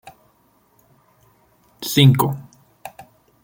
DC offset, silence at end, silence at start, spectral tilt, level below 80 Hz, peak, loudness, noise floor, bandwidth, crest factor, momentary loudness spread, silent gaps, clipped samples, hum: under 0.1%; 0.4 s; 0.05 s; -5.5 dB/octave; -58 dBFS; -2 dBFS; -17 LUFS; -59 dBFS; 17 kHz; 20 dB; 26 LU; none; under 0.1%; none